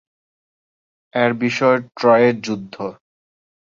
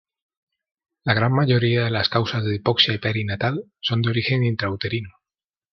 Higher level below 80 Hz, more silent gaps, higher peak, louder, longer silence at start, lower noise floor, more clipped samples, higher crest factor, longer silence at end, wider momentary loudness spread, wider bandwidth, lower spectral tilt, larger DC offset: second, -64 dBFS vs -58 dBFS; neither; about the same, -2 dBFS vs -2 dBFS; first, -17 LUFS vs -21 LUFS; about the same, 1.15 s vs 1.05 s; about the same, under -90 dBFS vs under -90 dBFS; neither; about the same, 18 dB vs 20 dB; first, 0.75 s vs 0.6 s; first, 16 LU vs 8 LU; first, 7.4 kHz vs 6.2 kHz; about the same, -6 dB/octave vs -7 dB/octave; neither